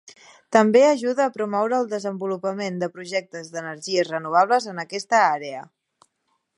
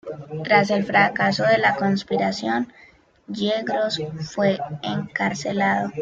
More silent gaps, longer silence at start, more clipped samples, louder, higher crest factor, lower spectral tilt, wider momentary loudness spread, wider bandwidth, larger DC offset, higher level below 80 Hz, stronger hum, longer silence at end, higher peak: neither; first, 0.5 s vs 0.05 s; neither; about the same, -22 LUFS vs -21 LUFS; about the same, 20 dB vs 18 dB; about the same, -4.5 dB/octave vs -5.5 dB/octave; first, 14 LU vs 10 LU; first, 11.5 kHz vs 7.6 kHz; neither; second, -76 dBFS vs -60 dBFS; neither; first, 0.95 s vs 0 s; about the same, -2 dBFS vs -4 dBFS